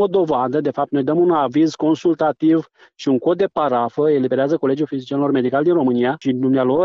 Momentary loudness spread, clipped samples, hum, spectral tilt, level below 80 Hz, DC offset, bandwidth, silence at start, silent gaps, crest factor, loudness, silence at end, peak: 4 LU; under 0.1%; none; -7.5 dB/octave; -62 dBFS; under 0.1%; 7.4 kHz; 0 s; none; 10 dB; -18 LUFS; 0 s; -6 dBFS